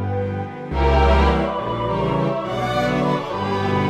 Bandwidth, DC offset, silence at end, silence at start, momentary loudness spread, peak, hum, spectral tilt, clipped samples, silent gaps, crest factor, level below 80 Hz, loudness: 8.8 kHz; under 0.1%; 0 s; 0 s; 8 LU; -4 dBFS; none; -7.5 dB/octave; under 0.1%; none; 16 dB; -26 dBFS; -20 LUFS